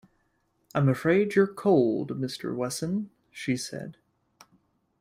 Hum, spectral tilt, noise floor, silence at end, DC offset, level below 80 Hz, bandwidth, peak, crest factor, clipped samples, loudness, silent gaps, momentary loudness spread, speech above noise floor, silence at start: none; -6 dB/octave; -72 dBFS; 1.1 s; under 0.1%; -64 dBFS; 15.5 kHz; -10 dBFS; 18 dB; under 0.1%; -27 LUFS; none; 14 LU; 46 dB; 0.75 s